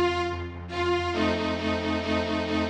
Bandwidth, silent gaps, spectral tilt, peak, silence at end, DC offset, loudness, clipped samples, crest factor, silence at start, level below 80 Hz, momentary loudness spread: 9.6 kHz; none; -5.5 dB/octave; -12 dBFS; 0 s; under 0.1%; -27 LUFS; under 0.1%; 14 dB; 0 s; -46 dBFS; 5 LU